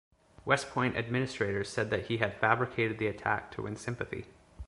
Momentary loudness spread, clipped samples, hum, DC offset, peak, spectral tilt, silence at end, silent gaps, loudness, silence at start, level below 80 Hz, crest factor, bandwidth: 10 LU; under 0.1%; none; under 0.1%; -8 dBFS; -5.5 dB/octave; 0 s; none; -32 LUFS; 0.45 s; -56 dBFS; 24 dB; 11.5 kHz